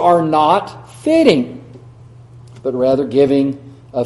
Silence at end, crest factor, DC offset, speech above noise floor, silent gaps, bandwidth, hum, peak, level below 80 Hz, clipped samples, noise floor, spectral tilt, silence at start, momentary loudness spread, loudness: 0 s; 16 dB; under 0.1%; 26 dB; none; 11.5 kHz; none; 0 dBFS; -52 dBFS; under 0.1%; -39 dBFS; -6.5 dB/octave; 0 s; 15 LU; -15 LUFS